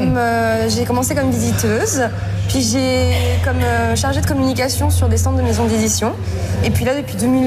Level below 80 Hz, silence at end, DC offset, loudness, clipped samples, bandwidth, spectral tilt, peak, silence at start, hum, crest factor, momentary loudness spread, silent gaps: -34 dBFS; 0 s; under 0.1%; -17 LUFS; under 0.1%; 15.5 kHz; -5 dB/octave; -8 dBFS; 0 s; none; 8 dB; 3 LU; none